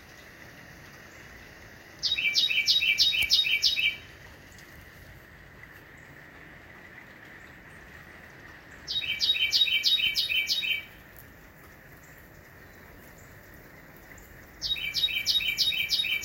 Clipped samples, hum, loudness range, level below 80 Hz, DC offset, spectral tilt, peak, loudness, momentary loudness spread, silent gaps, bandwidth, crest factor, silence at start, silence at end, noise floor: under 0.1%; none; 24 LU; -58 dBFS; under 0.1%; 0.5 dB/octave; -8 dBFS; -24 LUFS; 26 LU; none; 16.5 kHz; 22 dB; 0 s; 0 s; -51 dBFS